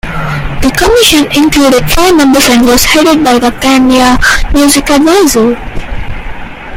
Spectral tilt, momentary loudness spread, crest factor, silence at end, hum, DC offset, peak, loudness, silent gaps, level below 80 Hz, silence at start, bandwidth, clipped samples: -3.5 dB/octave; 16 LU; 6 dB; 0 s; none; under 0.1%; 0 dBFS; -6 LUFS; none; -20 dBFS; 0.05 s; over 20 kHz; 0.6%